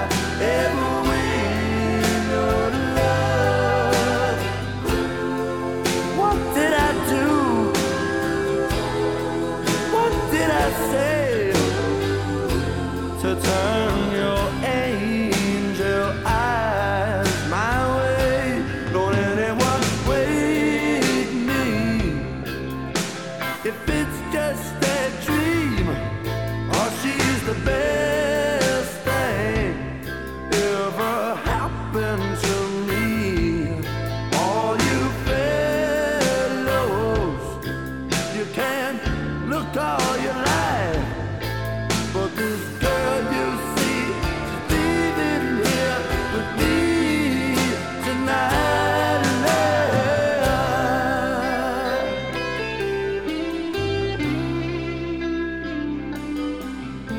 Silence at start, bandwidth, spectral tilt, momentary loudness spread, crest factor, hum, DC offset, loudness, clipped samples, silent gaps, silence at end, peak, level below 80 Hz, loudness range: 0 s; 19 kHz; -5 dB/octave; 7 LU; 16 dB; none; 0.4%; -22 LUFS; under 0.1%; none; 0 s; -6 dBFS; -36 dBFS; 4 LU